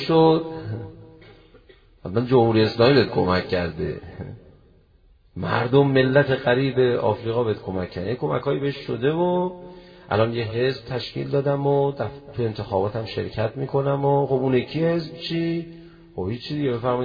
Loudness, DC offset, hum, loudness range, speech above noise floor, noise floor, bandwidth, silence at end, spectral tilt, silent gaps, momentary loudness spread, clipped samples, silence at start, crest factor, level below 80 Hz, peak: -22 LUFS; under 0.1%; none; 3 LU; 34 dB; -56 dBFS; 5.2 kHz; 0 s; -9 dB/octave; none; 14 LU; under 0.1%; 0 s; 18 dB; -52 dBFS; -4 dBFS